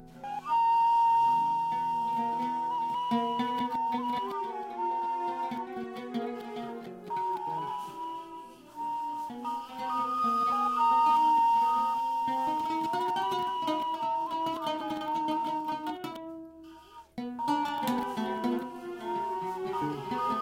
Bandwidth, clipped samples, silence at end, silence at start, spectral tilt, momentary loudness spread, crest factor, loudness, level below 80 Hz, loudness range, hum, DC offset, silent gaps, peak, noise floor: 16.5 kHz; under 0.1%; 0 s; 0 s; -5 dB/octave; 15 LU; 14 dB; -30 LUFS; -70 dBFS; 9 LU; none; under 0.1%; none; -16 dBFS; -51 dBFS